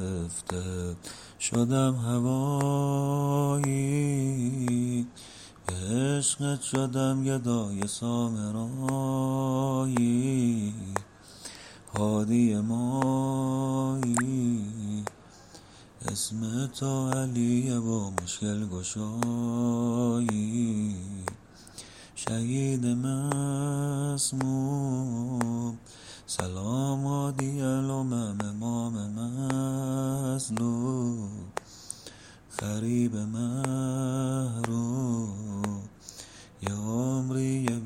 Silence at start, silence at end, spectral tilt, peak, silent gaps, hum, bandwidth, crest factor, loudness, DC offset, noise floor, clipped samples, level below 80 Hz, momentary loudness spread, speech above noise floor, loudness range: 0 s; 0 s; -6 dB/octave; -6 dBFS; none; none; 15.5 kHz; 22 dB; -29 LUFS; under 0.1%; -51 dBFS; under 0.1%; -60 dBFS; 12 LU; 23 dB; 4 LU